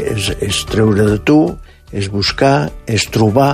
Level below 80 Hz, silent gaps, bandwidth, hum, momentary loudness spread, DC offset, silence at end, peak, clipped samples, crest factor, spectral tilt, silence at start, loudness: -34 dBFS; none; 15.5 kHz; none; 9 LU; under 0.1%; 0 s; 0 dBFS; under 0.1%; 14 dB; -5.5 dB/octave; 0 s; -14 LUFS